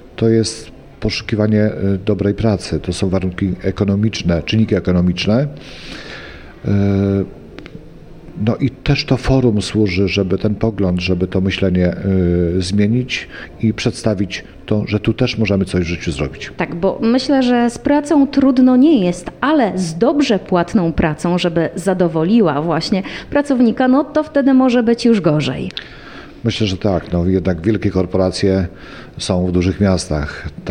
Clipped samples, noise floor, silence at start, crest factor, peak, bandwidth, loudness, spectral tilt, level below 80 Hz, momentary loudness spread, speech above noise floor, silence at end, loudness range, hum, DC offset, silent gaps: under 0.1%; -36 dBFS; 0.05 s; 14 dB; -2 dBFS; 11 kHz; -16 LUFS; -6.5 dB/octave; -36 dBFS; 11 LU; 21 dB; 0 s; 5 LU; none; under 0.1%; none